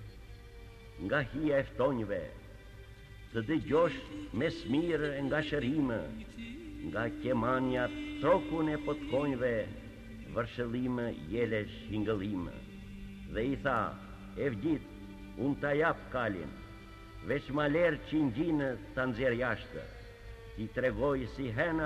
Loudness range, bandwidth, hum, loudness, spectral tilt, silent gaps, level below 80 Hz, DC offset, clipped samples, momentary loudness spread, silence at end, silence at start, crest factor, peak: 3 LU; 13 kHz; none; -34 LUFS; -7.5 dB/octave; none; -52 dBFS; under 0.1%; under 0.1%; 19 LU; 0 s; 0 s; 18 dB; -16 dBFS